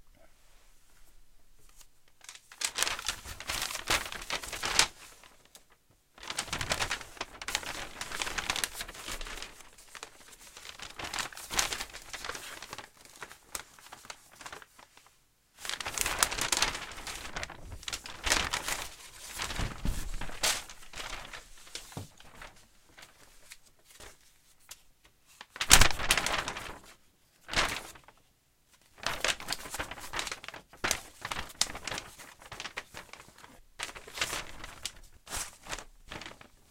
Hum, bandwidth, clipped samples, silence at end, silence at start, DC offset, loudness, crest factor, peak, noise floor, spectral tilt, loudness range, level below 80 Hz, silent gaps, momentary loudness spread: none; 17 kHz; under 0.1%; 0.35 s; 0.05 s; under 0.1%; -33 LUFS; 36 dB; 0 dBFS; -68 dBFS; -1 dB/octave; 14 LU; -46 dBFS; none; 22 LU